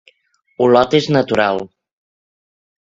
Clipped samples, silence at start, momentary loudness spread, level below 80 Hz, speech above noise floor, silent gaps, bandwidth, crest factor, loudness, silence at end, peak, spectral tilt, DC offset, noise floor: under 0.1%; 0.6 s; 10 LU; -52 dBFS; 41 dB; none; 7.8 kHz; 18 dB; -15 LUFS; 1.2 s; 0 dBFS; -6 dB/octave; under 0.1%; -55 dBFS